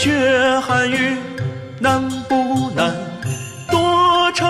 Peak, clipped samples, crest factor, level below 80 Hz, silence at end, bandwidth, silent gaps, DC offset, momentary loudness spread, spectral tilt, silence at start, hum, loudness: -4 dBFS; under 0.1%; 14 dB; -48 dBFS; 0 s; 15.5 kHz; none; under 0.1%; 12 LU; -4.5 dB/octave; 0 s; none; -17 LUFS